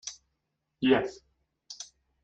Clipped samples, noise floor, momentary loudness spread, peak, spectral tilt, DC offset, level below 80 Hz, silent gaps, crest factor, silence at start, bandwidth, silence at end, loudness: under 0.1%; -81 dBFS; 20 LU; -10 dBFS; -4 dB/octave; under 0.1%; -66 dBFS; none; 24 dB; 0.05 s; 8.2 kHz; 0.4 s; -28 LUFS